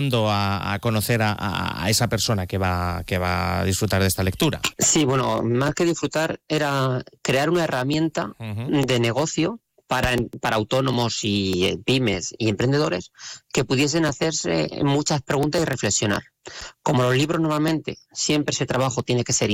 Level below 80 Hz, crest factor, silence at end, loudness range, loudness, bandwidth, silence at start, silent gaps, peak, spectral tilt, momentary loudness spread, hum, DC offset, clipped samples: -48 dBFS; 12 dB; 0 s; 2 LU; -22 LUFS; 17 kHz; 0 s; none; -10 dBFS; -4.5 dB/octave; 6 LU; none; under 0.1%; under 0.1%